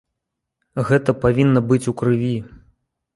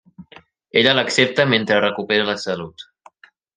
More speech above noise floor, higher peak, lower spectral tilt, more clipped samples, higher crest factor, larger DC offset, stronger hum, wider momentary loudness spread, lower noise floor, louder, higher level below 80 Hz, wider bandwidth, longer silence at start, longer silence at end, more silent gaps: first, 63 dB vs 32 dB; about the same, -2 dBFS vs -2 dBFS; first, -8 dB/octave vs -4 dB/octave; neither; about the same, 18 dB vs 20 dB; neither; neither; about the same, 11 LU vs 11 LU; first, -80 dBFS vs -50 dBFS; about the same, -19 LUFS vs -17 LUFS; first, -46 dBFS vs -64 dBFS; first, 11.5 kHz vs 10 kHz; first, 0.75 s vs 0.2 s; second, 0.6 s vs 0.75 s; neither